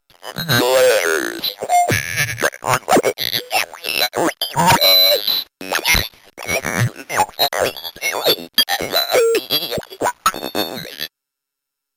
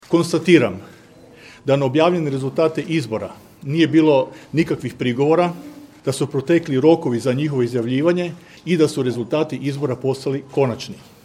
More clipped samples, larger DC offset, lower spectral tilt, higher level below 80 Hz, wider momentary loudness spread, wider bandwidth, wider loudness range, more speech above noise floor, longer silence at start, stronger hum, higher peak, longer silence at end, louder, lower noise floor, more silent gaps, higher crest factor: neither; neither; second, -2.5 dB/octave vs -6.5 dB/octave; first, -44 dBFS vs -60 dBFS; second, 10 LU vs 13 LU; first, 17 kHz vs 13.5 kHz; about the same, 4 LU vs 2 LU; first, 65 dB vs 27 dB; first, 0.25 s vs 0.1 s; neither; about the same, -2 dBFS vs 0 dBFS; first, 0.9 s vs 0.25 s; first, -16 LUFS vs -19 LUFS; first, -81 dBFS vs -45 dBFS; neither; about the same, 16 dB vs 18 dB